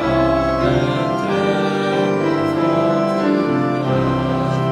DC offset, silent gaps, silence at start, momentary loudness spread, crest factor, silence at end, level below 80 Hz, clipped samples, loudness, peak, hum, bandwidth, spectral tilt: under 0.1%; none; 0 s; 2 LU; 12 dB; 0 s; -38 dBFS; under 0.1%; -18 LUFS; -4 dBFS; none; 11.5 kHz; -7.5 dB/octave